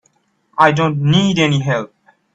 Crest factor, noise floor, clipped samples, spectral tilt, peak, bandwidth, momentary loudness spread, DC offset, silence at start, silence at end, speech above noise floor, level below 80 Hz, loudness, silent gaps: 16 dB; -61 dBFS; under 0.1%; -6 dB/octave; 0 dBFS; 8 kHz; 12 LU; under 0.1%; 0.55 s; 0.5 s; 47 dB; -52 dBFS; -15 LUFS; none